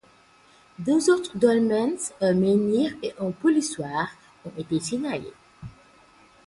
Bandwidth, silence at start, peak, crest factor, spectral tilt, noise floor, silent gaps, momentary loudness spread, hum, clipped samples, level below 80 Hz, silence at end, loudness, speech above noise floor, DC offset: 11.5 kHz; 0.8 s; -6 dBFS; 18 dB; -5.5 dB/octave; -56 dBFS; none; 22 LU; none; under 0.1%; -60 dBFS; 0.75 s; -24 LUFS; 33 dB; under 0.1%